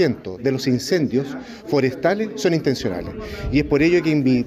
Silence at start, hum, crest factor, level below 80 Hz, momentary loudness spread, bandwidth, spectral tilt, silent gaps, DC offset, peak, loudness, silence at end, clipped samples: 0 s; none; 14 dB; -40 dBFS; 12 LU; 15.5 kHz; -6 dB/octave; none; under 0.1%; -6 dBFS; -20 LUFS; 0 s; under 0.1%